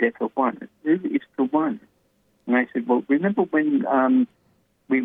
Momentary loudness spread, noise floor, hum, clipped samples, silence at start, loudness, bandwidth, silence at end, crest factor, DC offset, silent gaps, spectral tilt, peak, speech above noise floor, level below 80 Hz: 8 LU; -65 dBFS; none; under 0.1%; 0 s; -23 LUFS; 3.8 kHz; 0 s; 16 dB; under 0.1%; none; -9.5 dB/octave; -8 dBFS; 44 dB; -74 dBFS